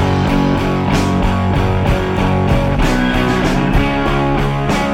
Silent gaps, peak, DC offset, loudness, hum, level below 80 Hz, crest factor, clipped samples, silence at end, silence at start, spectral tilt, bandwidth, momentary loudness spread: none; -2 dBFS; under 0.1%; -15 LUFS; none; -22 dBFS; 10 dB; under 0.1%; 0 s; 0 s; -6.5 dB/octave; 16 kHz; 1 LU